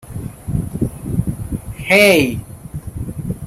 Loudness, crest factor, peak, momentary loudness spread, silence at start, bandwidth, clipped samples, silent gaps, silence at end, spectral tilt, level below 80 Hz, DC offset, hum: -17 LUFS; 18 dB; 0 dBFS; 20 LU; 0.05 s; 16.5 kHz; under 0.1%; none; 0 s; -5 dB/octave; -34 dBFS; under 0.1%; none